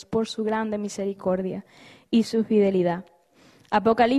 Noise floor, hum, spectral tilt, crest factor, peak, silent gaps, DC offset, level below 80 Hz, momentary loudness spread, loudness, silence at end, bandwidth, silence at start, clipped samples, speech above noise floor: -56 dBFS; none; -6 dB/octave; 18 dB; -6 dBFS; none; under 0.1%; -60 dBFS; 9 LU; -25 LUFS; 0 s; 12 kHz; 0.1 s; under 0.1%; 33 dB